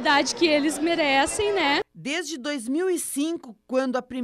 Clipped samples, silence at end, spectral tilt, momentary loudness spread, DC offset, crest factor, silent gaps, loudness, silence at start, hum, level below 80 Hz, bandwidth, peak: under 0.1%; 0 s; -2 dB/octave; 8 LU; under 0.1%; 16 dB; none; -24 LUFS; 0 s; none; -58 dBFS; 15.5 kHz; -8 dBFS